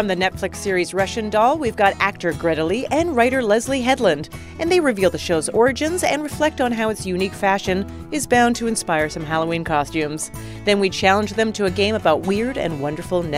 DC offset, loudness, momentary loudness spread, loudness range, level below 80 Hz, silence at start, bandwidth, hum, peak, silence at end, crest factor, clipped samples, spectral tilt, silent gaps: under 0.1%; -20 LUFS; 7 LU; 2 LU; -42 dBFS; 0 s; 16 kHz; none; -2 dBFS; 0 s; 18 dB; under 0.1%; -4.5 dB/octave; none